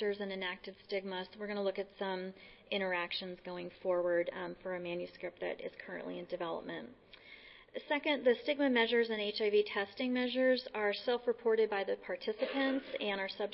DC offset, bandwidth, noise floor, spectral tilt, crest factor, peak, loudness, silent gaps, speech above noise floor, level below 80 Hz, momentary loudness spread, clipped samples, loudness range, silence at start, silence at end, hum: under 0.1%; 5.8 kHz; -57 dBFS; -2 dB/octave; 18 dB; -18 dBFS; -36 LUFS; none; 21 dB; -74 dBFS; 13 LU; under 0.1%; 8 LU; 0 s; 0 s; none